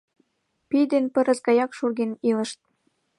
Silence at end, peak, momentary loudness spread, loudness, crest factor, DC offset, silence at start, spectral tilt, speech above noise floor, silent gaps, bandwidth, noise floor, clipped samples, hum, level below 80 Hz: 0.65 s; -8 dBFS; 6 LU; -23 LUFS; 16 dB; under 0.1%; 0.7 s; -5 dB/octave; 48 dB; none; 11.5 kHz; -70 dBFS; under 0.1%; none; -76 dBFS